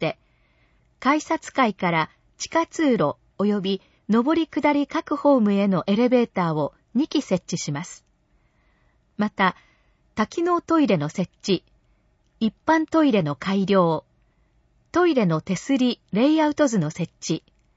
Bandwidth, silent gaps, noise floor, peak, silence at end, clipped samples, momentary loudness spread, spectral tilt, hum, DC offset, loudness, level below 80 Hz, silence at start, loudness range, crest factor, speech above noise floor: 8 kHz; none; -63 dBFS; -6 dBFS; 0.4 s; under 0.1%; 9 LU; -6 dB/octave; none; under 0.1%; -22 LUFS; -60 dBFS; 0 s; 5 LU; 18 dB; 42 dB